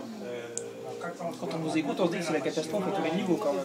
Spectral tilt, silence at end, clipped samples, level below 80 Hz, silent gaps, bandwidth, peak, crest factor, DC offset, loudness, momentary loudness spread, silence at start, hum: -5 dB/octave; 0 s; under 0.1%; -78 dBFS; none; 16 kHz; -10 dBFS; 22 dB; under 0.1%; -31 LUFS; 10 LU; 0 s; none